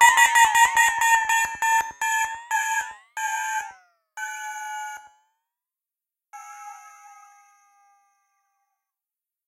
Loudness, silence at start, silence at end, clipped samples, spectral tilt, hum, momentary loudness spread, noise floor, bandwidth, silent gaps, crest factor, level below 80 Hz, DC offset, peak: -21 LUFS; 0 s; 2.6 s; under 0.1%; 3 dB/octave; none; 25 LU; -90 dBFS; 16 kHz; none; 22 dB; -64 dBFS; under 0.1%; -2 dBFS